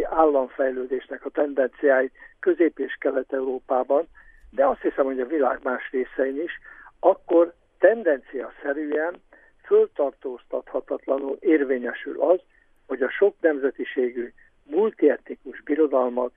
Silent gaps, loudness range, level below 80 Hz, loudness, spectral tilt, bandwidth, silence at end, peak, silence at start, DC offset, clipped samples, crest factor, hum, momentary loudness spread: none; 2 LU; -58 dBFS; -24 LUFS; -8 dB/octave; 3.7 kHz; 0.05 s; -4 dBFS; 0 s; under 0.1%; under 0.1%; 20 dB; none; 10 LU